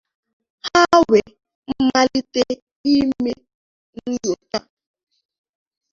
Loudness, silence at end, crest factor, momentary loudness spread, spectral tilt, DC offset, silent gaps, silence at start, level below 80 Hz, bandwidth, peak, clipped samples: -18 LUFS; 1.35 s; 20 dB; 15 LU; -4 dB/octave; under 0.1%; 1.55-1.63 s, 2.62-2.84 s, 3.54-3.93 s; 0.65 s; -52 dBFS; 7.6 kHz; -2 dBFS; under 0.1%